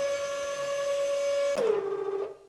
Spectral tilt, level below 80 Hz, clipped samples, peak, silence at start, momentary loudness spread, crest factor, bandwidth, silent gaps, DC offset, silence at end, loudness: -2.5 dB/octave; -70 dBFS; under 0.1%; -14 dBFS; 0 s; 5 LU; 14 dB; 12.5 kHz; none; under 0.1%; 0.05 s; -29 LUFS